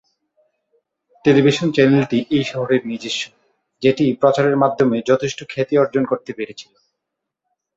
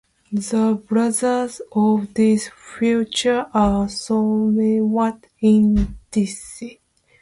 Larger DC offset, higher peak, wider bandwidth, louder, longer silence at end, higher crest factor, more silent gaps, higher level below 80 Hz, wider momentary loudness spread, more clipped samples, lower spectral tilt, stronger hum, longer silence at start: neither; first, -2 dBFS vs -6 dBFS; second, 8 kHz vs 11.5 kHz; about the same, -17 LUFS vs -19 LUFS; first, 1.15 s vs 0.5 s; about the same, 18 dB vs 14 dB; neither; second, -58 dBFS vs -38 dBFS; about the same, 10 LU vs 9 LU; neither; about the same, -6 dB/octave vs -5.5 dB/octave; neither; first, 1.25 s vs 0.3 s